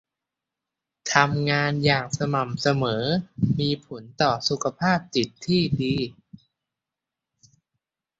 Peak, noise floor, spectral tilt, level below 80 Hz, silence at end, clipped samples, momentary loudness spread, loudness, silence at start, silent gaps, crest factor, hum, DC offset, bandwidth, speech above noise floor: -2 dBFS; -87 dBFS; -5 dB/octave; -54 dBFS; 2.1 s; under 0.1%; 6 LU; -24 LUFS; 1.05 s; none; 24 dB; none; under 0.1%; 8 kHz; 64 dB